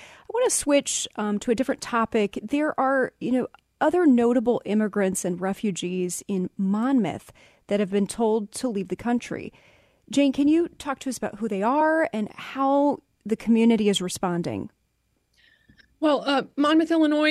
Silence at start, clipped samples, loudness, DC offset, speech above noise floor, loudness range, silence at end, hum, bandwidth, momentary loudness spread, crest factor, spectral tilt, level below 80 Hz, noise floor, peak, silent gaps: 0 s; under 0.1%; -24 LUFS; under 0.1%; 48 dB; 3 LU; 0 s; none; 14.5 kHz; 10 LU; 16 dB; -4.5 dB/octave; -60 dBFS; -71 dBFS; -8 dBFS; none